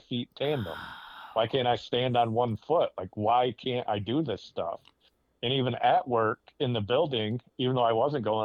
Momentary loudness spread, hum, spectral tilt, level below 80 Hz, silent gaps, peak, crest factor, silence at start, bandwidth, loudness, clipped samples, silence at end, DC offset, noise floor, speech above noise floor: 10 LU; none; -7.5 dB/octave; -66 dBFS; none; -12 dBFS; 16 dB; 0.1 s; 14 kHz; -29 LUFS; under 0.1%; 0 s; under 0.1%; -66 dBFS; 38 dB